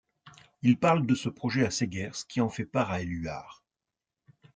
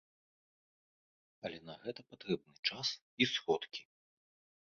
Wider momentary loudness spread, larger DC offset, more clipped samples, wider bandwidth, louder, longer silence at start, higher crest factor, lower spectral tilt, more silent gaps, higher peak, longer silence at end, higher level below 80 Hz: second, 11 LU vs 14 LU; neither; neither; first, 9.2 kHz vs 7.2 kHz; first, -29 LUFS vs -38 LUFS; second, 0.25 s vs 1.45 s; second, 18 dB vs 26 dB; first, -5.5 dB/octave vs -2 dB/octave; second, none vs 2.59-2.63 s, 3.02-3.17 s; first, -12 dBFS vs -16 dBFS; first, 1 s vs 0.85 s; first, -60 dBFS vs -80 dBFS